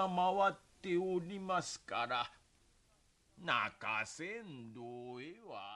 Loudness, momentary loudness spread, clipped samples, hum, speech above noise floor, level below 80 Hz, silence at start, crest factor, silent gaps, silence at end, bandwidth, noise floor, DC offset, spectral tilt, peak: -38 LUFS; 15 LU; under 0.1%; none; 33 dB; -74 dBFS; 0 s; 20 dB; none; 0 s; 11.5 kHz; -72 dBFS; under 0.1%; -4 dB/octave; -20 dBFS